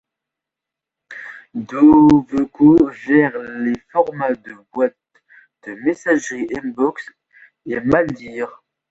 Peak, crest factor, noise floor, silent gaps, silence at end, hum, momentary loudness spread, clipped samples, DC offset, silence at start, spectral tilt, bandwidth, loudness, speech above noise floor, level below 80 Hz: -2 dBFS; 16 dB; -85 dBFS; none; 0.4 s; none; 22 LU; under 0.1%; under 0.1%; 1.1 s; -7 dB/octave; 7.8 kHz; -17 LUFS; 69 dB; -50 dBFS